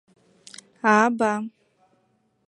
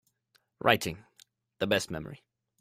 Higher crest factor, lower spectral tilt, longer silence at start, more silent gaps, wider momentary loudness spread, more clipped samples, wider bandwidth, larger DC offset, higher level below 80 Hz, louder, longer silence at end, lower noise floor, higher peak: about the same, 22 dB vs 26 dB; about the same, -5 dB/octave vs -4 dB/octave; first, 0.85 s vs 0.65 s; neither; first, 25 LU vs 20 LU; neither; second, 11 kHz vs 16 kHz; neither; second, -72 dBFS vs -62 dBFS; first, -21 LUFS vs -30 LUFS; first, 1 s vs 0.45 s; second, -68 dBFS vs -72 dBFS; first, -4 dBFS vs -8 dBFS